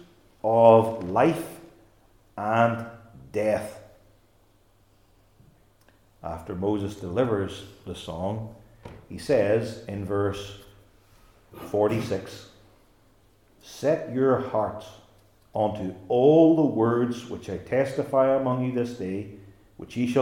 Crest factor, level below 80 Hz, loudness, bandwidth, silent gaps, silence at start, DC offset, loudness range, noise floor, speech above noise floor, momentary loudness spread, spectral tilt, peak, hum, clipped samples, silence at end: 24 dB; -58 dBFS; -25 LUFS; 17 kHz; none; 0.45 s; under 0.1%; 10 LU; -61 dBFS; 37 dB; 21 LU; -7.5 dB/octave; -2 dBFS; none; under 0.1%; 0 s